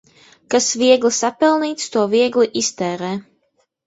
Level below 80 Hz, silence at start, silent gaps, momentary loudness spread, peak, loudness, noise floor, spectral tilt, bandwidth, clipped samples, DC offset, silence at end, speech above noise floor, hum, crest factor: -64 dBFS; 0.5 s; none; 10 LU; -2 dBFS; -17 LUFS; -65 dBFS; -3 dB/octave; 8 kHz; under 0.1%; under 0.1%; 0.65 s; 49 dB; none; 16 dB